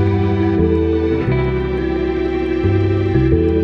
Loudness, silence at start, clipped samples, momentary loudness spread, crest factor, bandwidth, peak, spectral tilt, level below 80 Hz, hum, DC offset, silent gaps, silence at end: -17 LUFS; 0 s; under 0.1%; 4 LU; 14 dB; 5.8 kHz; -2 dBFS; -10 dB/octave; -26 dBFS; none; under 0.1%; none; 0 s